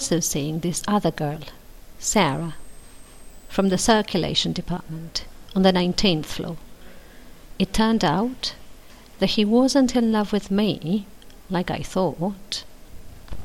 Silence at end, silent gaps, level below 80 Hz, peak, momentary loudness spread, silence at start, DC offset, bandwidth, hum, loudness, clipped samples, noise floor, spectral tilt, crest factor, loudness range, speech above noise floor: 0 s; none; -42 dBFS; -4 dBFS; 12 LU; 0 s; under 0.1%; 17 kHz; none; -23 LUFS; under 0.1%; -43 dBFS; -4.5 dB/octave; 20 dB; 4 LU; 21 dB